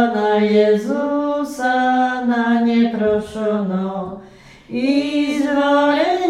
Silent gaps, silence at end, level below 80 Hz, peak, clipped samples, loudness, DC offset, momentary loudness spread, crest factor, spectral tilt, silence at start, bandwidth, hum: none; 0 s; -54 dBFS; -4 dBFS; under 0.1%; -17 LUFS; under 0.1%; 8 LU; 14 dB; -6 dB/octave; 0 s; 12.5 kHz; none